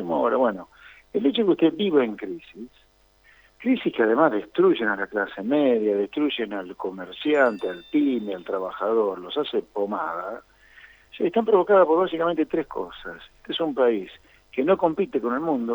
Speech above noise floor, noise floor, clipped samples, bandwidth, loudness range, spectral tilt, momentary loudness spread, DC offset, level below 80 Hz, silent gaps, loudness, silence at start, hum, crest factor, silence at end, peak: 35 dB; -58 dBFS; under 0.1%; over 20 kHz; 3 LU; -7.5 dB/octave; 13 LU; under 0.1%; -62 dBFS; none; -23 LUFS; 0 s; none; 18 dB; 0 s; -4 dBFS